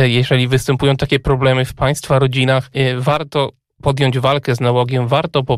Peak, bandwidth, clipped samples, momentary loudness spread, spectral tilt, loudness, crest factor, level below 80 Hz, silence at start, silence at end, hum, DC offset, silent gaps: -2 dBFS; 14 kHz; under 0.1%; 4 LU; -6 dB/octave; -16 LUFS; 14 dB; -36 dBFS; 0 s; 0 s; none; under 0.1%; none